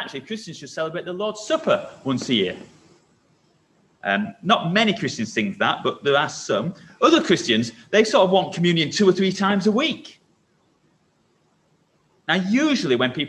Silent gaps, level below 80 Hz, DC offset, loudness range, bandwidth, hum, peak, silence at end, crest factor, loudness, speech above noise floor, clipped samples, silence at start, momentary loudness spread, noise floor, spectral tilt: none; -64 dBFS; under 0.1%; 7 LU; 11 kHz; none; -2 dBFS; 0 s; 20 dB; -21 LUFS; 43 dB; under 0.1%; 0 s; 12 LU; -64 dBFS; -4.5 dB/octave